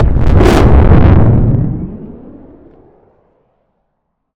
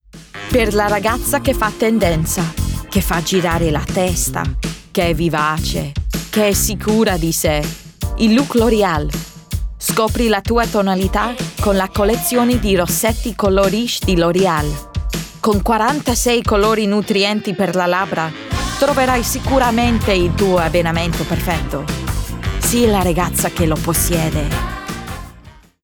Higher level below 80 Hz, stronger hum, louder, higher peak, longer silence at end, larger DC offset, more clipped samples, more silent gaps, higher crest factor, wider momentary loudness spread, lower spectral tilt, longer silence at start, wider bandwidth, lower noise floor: first, -14 dBFS vs -28 dBFS; neither; first, -9 LUFS vs -16 LUFS; first, 0 dBFS vs -4 dBFS; first, 2.2 s vs 0.3 s; neither; neither; neither; about the same, 10 dB vs 14 dB; first, 18 LU vs 9 LU; first, -8.5 dB/octave vs -4.5 dB/octave; second, 0 s vs 0.15 s; second, 10.5 kHz vs over 20 kHz; first, -67 dBFS vs -42 dBFS